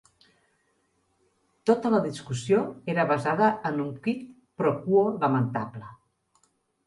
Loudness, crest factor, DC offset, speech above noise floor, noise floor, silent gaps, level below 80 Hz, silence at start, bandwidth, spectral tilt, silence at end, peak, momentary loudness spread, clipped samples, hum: -26 LUFS; 18 dB; under 0.1%; 46 dB; -71 dBFS; none; -68 dBFS; 1.65 s; 11.5 kHz; -7 dB/octave; 0.9 s; -8 dBFS; 11 LU; under 0.1%; none